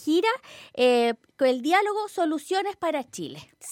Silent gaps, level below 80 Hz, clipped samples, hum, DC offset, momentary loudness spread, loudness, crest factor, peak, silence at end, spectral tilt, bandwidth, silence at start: none; -76 dBFS; under 0.1%; none; under 0.1%; 15 LU; -25 LUFS; 16 dB; -10 dBFS; 0 s; -3.5 dB/octave; 16 kHz; 0 s